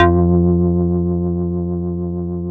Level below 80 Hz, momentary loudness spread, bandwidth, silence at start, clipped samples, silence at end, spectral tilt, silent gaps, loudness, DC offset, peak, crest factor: -32 dBFS; 9 LU; 3.7 kHz; 0 s; under 0.1%; 0 s; -11 dB/octave; none; -18 LUFS; under 0.1%; 0 dBFS; 16 dB